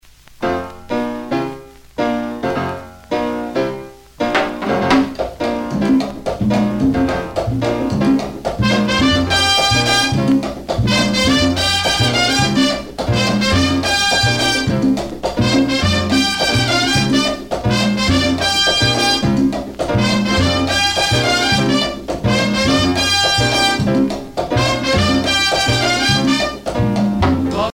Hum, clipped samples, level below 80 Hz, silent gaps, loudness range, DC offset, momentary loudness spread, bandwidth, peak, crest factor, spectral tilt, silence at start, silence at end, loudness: none; under 0.1%; -34 dBFS; none; 5 LU; under 0.1%; 9 LU; 18 kHz; -2 dBFS; 14 dB; -4 dB/octave; 0.4 s; 0 s; -15 LUFS